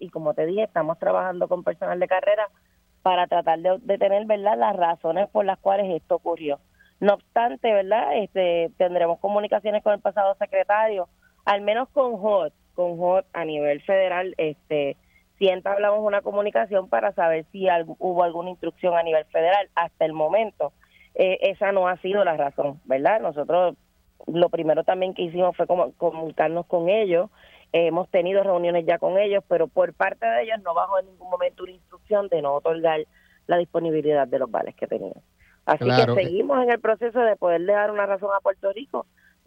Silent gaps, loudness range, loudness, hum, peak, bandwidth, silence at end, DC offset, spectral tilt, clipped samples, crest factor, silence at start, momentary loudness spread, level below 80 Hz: none; 2 LU; -23 LUFS; none; -4 dBFS; 6.2 kHz; 0.45 s; under 0.1%; -7.5 dB/octave; under 0.1%; 20 dB; 0 s; 7 LU; -66 dBFS